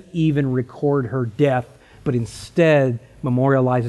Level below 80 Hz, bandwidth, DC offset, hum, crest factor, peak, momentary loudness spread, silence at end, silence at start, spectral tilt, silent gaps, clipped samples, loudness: -50 dBFS; 12 kHz; under 0.1%; none; 14 dB; -4 dBFS; 9 LU; 0 s; 0.15 s; -8 dB/octave; none; under 0.1%; -20 LUFS